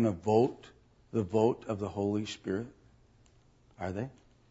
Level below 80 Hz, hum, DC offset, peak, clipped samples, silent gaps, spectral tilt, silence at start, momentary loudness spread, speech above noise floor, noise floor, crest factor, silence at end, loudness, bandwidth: -64 dBFS; none; under 0.1%; -14 dBFS; under 0.1%; none; -7 dB/octave; 0 s; 14 LU; 32 dB; -63 dBFS; 20 dB; 0.4 s; -32 LUFS; 8 kHz